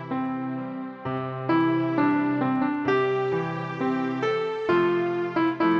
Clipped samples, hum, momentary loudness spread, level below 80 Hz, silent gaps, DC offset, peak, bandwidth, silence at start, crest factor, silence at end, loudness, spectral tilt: under 0.1%; none; 8 LU; -66 dBFS; none; under 0.1%; -12 dBFS; 6.8 kHz; 0 s; 14 dB; 0 s; -25 LUFS; -8 dB/octave